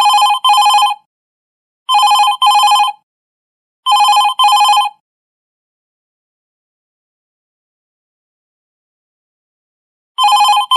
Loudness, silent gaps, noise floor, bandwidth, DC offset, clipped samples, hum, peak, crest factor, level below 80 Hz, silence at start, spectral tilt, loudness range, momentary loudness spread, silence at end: -10 LUFS; 1.06-1.86 s, 3.03-3.83 s, 5.00-10.15 s; under -90 dBFS; 13 kHz; under 0.1%; under 0.1%; none; -2 dBFS; 12 dB; -84 dBFS; 0 s; 4.5 dB/octave; 7 LU; 11 LU; 0 s